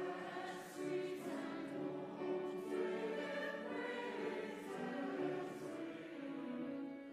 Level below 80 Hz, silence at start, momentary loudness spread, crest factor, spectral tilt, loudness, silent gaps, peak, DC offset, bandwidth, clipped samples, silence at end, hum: -90 dBFS; 0 s; 5 LU; 14 dB; -5.5 dB/octave; -45 LUFS; none; -30 dBFS; under 0.1%; 15 kHz; under 0.1%; 0 s; none